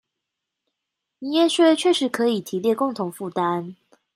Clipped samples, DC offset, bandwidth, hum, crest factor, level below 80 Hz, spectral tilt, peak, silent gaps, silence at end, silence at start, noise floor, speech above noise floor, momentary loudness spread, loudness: under 0.1%; under 0.1%; 15.5 kHz; none; 18 dB; -76 dBFS; -4.5 dB/octave; -6 dBFS; none; 0.4 s; 1.2 s; -83 dBFS; 62 dB; 12 LU; -21 LUFS